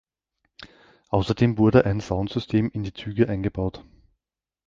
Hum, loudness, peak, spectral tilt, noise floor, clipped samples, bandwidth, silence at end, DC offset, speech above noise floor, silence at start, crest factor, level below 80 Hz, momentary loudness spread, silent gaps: none; -23 LUFS; -2 dBFS; -8 dB/octave; -86 dBFS; under 0.1%; 7.6 kHz; 0.85 s; under 0.1%; 64 dB; 0.6 s; 22 dB; -44 dBFS; 12 LU; none